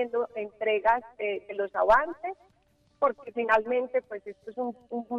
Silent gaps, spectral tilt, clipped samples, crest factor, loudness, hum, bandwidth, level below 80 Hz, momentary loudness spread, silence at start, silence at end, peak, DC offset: none; -5.5 dB/octave; under 0.1%; 18 dB; -28 LUFS; none; 7.8 kHz; -58 dBFS; 15 LU; 0 s; 0 s; -10 dBFS; under 0.1%